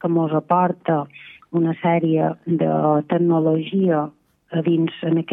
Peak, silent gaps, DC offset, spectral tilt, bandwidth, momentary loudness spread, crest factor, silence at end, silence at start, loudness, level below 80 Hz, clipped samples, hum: -4 dBFS; none; under 0.1%; -11 dB/octave; 3.9 kHz; 6 LU; 16 dB; 0 s; 0.05 s; -20 LUFS; -70 dBFS; under 0.1%; none